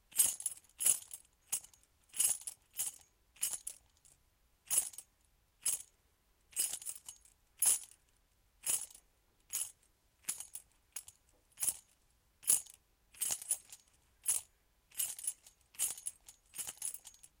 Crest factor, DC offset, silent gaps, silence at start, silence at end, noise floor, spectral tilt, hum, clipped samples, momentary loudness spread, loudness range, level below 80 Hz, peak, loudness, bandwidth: 28 dB; under 0.1%; none; 0.1 s; 0.3 s; -74 dBFS; 2 dB/octave; none; under 0.1%; 20 LU; 6 LU; -76 dBFS; -12 dBFS; -36 LUFS; 17 kHz